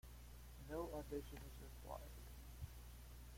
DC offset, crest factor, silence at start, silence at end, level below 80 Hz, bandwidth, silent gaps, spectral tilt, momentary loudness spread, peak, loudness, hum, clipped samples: under 0.1%; 18 dB; 0.05 s; 0 s; -58 dBFS; 16.5 kHz; none; -5.5 dB/octave; 11 LU; -36 dBFS; -54 LUFS; 60 Hz at -55 dBFS; under 0.1%